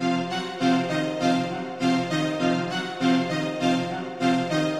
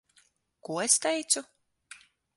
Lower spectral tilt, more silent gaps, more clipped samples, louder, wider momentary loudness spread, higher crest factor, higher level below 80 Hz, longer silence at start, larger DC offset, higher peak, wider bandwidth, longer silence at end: first, -5.5 dB/octave vs -1 dB/octave; neither; neither; about the same, -25 LUFS vs -27 LUFS; second, 4 LU vs 13 LU; second, 14 dB vs 24 dB; first, -66 dBFS vs -80 dBFS; second, 0 s vs 0.7 s; first, 0.1% vs under 0.1%; about the same, -10 dBFS vs -8 dBFS; about the same, 12 kHz vs 12 kHz; second, 0 s vs 0.4 s